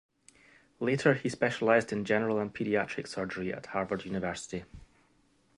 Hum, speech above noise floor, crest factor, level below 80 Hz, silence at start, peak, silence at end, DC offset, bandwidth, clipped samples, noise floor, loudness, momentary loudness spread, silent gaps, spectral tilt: none; 38 dB; 22 dB; -62 dBFS; 0.8 s; -10 dBFS; 0.75 s; under 0.1%; 11.5 kHz; under 0.1%; -68 dBFS; -31 LUFS; 10 LU; none; -5.5 dB/octave